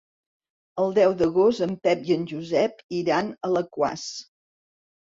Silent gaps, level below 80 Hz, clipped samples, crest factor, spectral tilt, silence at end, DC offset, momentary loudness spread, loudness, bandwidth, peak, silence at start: 2.84-2.89 s; -64 dBFS; under 0.1%; 18 dB; -5.5 dB/octave; 0.85 s; under 0.1%; 10 LU; -24 LUFS; 7.8 kHz; -8 dBFS; 0.75 s